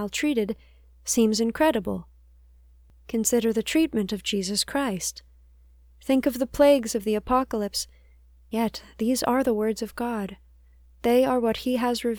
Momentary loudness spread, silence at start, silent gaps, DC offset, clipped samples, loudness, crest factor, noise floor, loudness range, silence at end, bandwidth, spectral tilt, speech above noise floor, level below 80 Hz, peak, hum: 11 LU; 0 s; none; under 0.1%; under 0.1%; -25 LUFS; 20 dB; -54 dBFS; 2 LU; 0 s; over 20 kHz; -4 dB/octave; 30 dB; -50 dBFS; -6 dBFS; none